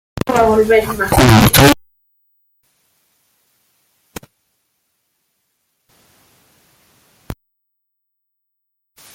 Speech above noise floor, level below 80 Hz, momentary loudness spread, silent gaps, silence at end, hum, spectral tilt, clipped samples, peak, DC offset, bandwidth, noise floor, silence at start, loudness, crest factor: 65 dB; -34 dBFS; 28 LU; none; 1.8 s; 50 Hz at -55 dBFS; -5 dB/octave; under 0.1%; 0 dBFS; under 0.1%; 18 kHz; -75 dBFS; 0.15 s; -11 LUFS; 18 dB